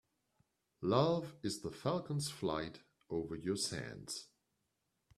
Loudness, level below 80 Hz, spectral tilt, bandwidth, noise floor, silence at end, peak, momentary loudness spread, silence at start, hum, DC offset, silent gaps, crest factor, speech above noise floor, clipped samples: -39 LUFS; -70 dBFS; -5 dB/octave; 13.5 kHz; -84 dBFS; 0.9 s; -16 dBFS; 12 LU; 0.8 s; none; under 0.1%; none; 24 dB; 46 dB; under 0.1%